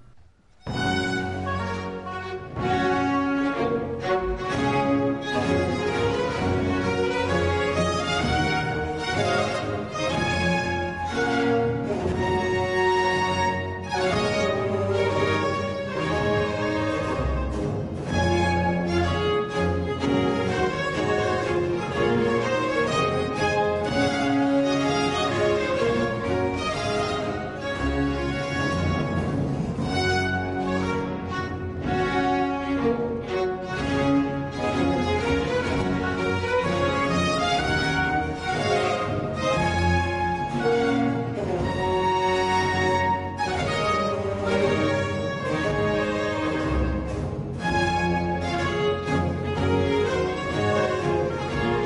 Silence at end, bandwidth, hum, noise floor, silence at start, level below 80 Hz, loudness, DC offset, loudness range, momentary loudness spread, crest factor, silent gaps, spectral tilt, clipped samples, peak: 0 s; 10.5 kHz; none; -52 dBFS; 0 s; -40 dBFS; -24 LUFS; under 0.1%; 2 LU; 5 LU; 12 dB; none; -6 dB/octave; under 0.1%; -12 dBFS